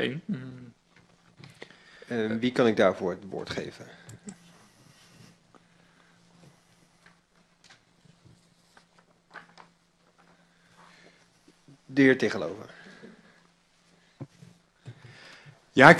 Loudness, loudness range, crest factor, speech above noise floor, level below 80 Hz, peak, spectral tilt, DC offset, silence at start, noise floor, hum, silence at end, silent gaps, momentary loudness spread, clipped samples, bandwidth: -26 LUFS; 15 LU; 30 dB; 39 dB; -66 dBFS; 0 dBFS; -6 dB/octave; under 0.1%; 0 s; -65 dBFS; none; 0 s; none; 28 LU; under 0.1%; 12.5 kHz